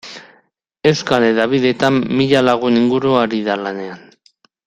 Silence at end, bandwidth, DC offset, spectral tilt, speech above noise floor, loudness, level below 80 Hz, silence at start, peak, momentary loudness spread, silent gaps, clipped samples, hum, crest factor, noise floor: 0.7 s; 9.8 kHz; under 0.1%; -6 dB/octave; 43 dB; -15 LUFS; -54 dBFS; 0.05 s; 0 dBFS; 13 LU; none; under 0.1%; none; 16 dB; -58 dBFS